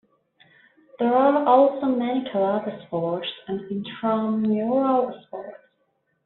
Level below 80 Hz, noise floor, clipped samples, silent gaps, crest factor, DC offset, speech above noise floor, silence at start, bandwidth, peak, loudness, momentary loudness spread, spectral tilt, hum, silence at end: -70 dBFS; -71 dBFS; under 0.1%; none; 20 dB; under 0.1%; 49 dB; 1 s; 4.2 kHz; -4 dBFS; -23 LUFS; 14 LU; -5 dB/octave; none; 0.7 s